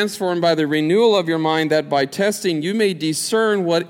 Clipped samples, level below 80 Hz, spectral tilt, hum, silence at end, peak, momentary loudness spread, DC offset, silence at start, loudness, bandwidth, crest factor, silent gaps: under 0.1%; -70 dBFS; -4.5 dB/octave; none; 0 s; -4 dBFS; 5 LU; under 0.1%; 0 s; -18 LUFS; 17 kHz; 14 dB; none